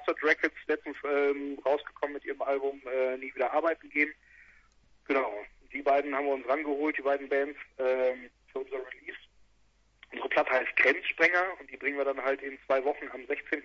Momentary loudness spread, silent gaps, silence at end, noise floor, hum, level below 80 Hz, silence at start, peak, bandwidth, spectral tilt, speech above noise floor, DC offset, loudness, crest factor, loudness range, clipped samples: 14 LU; none; 0 s; -66 dBFS; none; -68 dBFS; 0 s; -10 dBFS; 7.2 kHz; -4 dB/octave; 36 dB; under 0.1%; -30 LUFS; 20 dB; 5 LU; under 0.1%